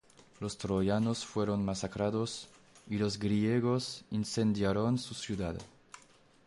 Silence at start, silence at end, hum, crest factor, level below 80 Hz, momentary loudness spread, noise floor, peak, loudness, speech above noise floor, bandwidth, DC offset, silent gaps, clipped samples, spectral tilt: 0.4 s; 0.5 s; none; 14 dB; -56 dBFS; 11 LU; -62 dBFS; -18 dBFS; -33 LUFS; 30 dB; 11.5 kHz; under 0.1%; none; under 0.1%; -6 dB/octave